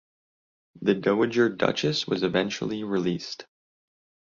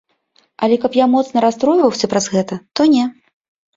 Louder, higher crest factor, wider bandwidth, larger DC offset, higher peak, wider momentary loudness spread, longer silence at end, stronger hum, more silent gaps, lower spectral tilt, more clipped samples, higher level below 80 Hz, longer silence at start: second, -26 LUFS vs -15 LUFS; first, 20 dB vs 14 dB; about the same, 7.4 kHz vs 7.8 kHz; neither; second, -6 dBFS vs -2 dBFS; about the same, 8 LU vs 7 LU; first, 0.9 s vs 0.65 s; neither; neither; about the same, -5.5 dB/octave vs -5 dB/octave; neither; second, -64 dBFS vs -58 dBFS; first, 0.75 s vs 0.6 s